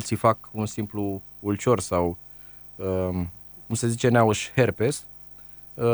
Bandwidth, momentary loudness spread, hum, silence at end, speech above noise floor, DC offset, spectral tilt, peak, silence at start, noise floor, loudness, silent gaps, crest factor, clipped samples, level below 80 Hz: over 20 kHz; 20 LU; 50 Hz at -55 dBFS; 0 s; 21 dB; under 0.1%; -5.5 dB/octave; -6 dBFS; 0 s; -45 dBFS; -25 LUFS; none; 20 dB; under 0.1%; -52 dBFS